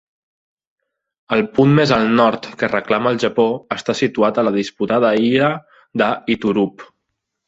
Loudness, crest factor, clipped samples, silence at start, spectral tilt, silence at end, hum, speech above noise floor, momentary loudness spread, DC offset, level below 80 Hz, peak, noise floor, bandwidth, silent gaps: -17 LUFS; 16 dB; under 0.1%; 1.3 s; -6.5 dB/octave; 0.6 s; none; 60 dB; 8 LU; under 0.1%; -54 dBFS; -2 dBFS; -76 dBFS; 8 kHz; none